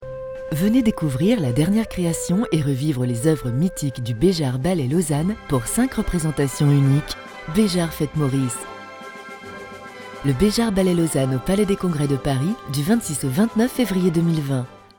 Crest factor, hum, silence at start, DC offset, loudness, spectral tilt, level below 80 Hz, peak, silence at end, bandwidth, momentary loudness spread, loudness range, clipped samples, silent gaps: 16 dB; none; 0 s; under 0.1%; -21 LUFS; -6 dB/octave; -40 dBFS; -4 dBFS; 0.2 s; 19.5 kHz; 13 LU; 3 LU; under 0.1%; none